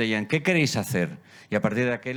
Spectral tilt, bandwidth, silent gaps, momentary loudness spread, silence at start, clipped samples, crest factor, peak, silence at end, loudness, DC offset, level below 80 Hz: -5 dB/octave; over 20 kHz; none; 8 LU; 0 s; under 0.1%; 18 dB; -8 dBFS; 0 s; -25 LUFS; under 0.1%; -62 dBFS